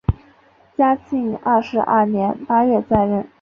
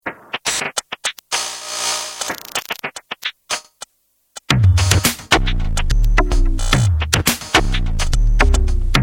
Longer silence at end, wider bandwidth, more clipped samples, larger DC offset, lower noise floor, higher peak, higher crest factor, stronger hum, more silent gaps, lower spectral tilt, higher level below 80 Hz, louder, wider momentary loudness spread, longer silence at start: first, 0.15 s vs 0 s; second, 6.4 kHz vs 17.5 kHz; neither; neither; second, -52 dBFS vs -64 dBFS; about the same, -2 dBFS vs 0 dBFS; about the same, 16 dB vs 16 dB; neither; neither; first, -9.5 dB/octave vs -3.5 dB/octave; second, -36 dBFS vs -20 dBFS; about the same, -18 LUFS vs -18 LUFS; second, 7 LU vs 11 LU; about the same, 0.1 s vs 0.05 s